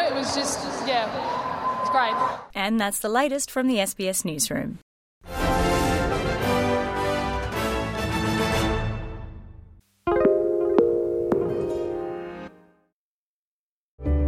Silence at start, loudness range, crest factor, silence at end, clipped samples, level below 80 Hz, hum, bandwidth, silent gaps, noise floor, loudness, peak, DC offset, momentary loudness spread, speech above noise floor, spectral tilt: 0 s; 3 LU; 20 dB; 0 s; under 0.1%; -38 dBFS; none; 16.5 kHz; 4.82-5.21 s, 12.92-13.98 s; under -90 dBFS; -24 LUFS; -4 dBFS; under 0.1%; 12 LU; over 65 dB; -4.5 dB/octave